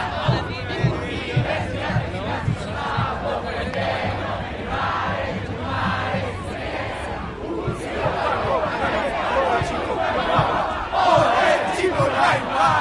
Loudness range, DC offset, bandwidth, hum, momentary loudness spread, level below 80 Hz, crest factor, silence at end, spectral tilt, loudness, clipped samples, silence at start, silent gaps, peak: 6 LU; under 0.1%; 11.5 kHz; none; 9 LU; -40 dBFS; 18 dB; 0 s; -6 dB/octave; -22 LUFS; under 0.1%; 0 s; none; -4 dBFS